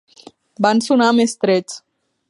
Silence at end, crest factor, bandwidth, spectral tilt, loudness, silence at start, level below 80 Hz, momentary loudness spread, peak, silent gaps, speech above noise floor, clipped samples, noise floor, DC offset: 0.5 s; 18 dB; 11.5 kHz; -4.5 dB/octave; -16 LUFS; 0.6 s; -68 dBFS; 14 LU; 0 dBFS; none; 30 dB; under 0.1%; -46 dBFS; under 0.1%